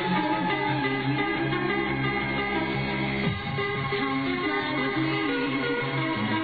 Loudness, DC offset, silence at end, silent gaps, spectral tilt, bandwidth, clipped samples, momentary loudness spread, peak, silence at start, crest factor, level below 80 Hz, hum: -26 LUFS; 0.1%; 0 s; none; -8.5 dB/octave; 5 kHz; under 0.1%; 2 LU; -14 dBFS; 0 s; 14 dB; -50 dBFS; none